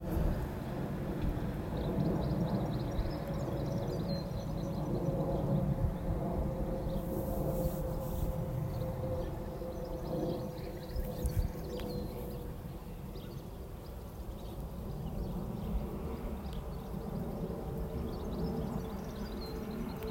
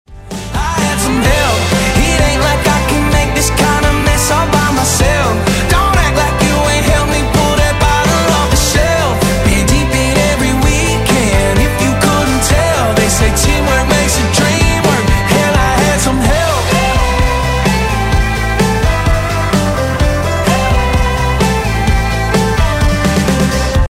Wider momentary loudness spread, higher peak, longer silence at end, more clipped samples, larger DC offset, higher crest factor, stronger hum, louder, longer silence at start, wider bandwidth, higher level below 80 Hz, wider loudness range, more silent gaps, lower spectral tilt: first, 10 LU vs 3 LU; second, -20 dBFS vs 0 dBFS; about the same, 0 s vs 0 s; neither; neither; first, 16 dB vs 10 dB; neither; second, -38 LUFS vs -12 LUFS; about the same, 0 s vs 0.1 s; about the same, 16 kHz vs 16.5 kHz; second, -42 dBFS vs -18 dBFS; first, 7 LU vs 2 LU; neither; first, -8 dB/octave vs -4.5 dB/octave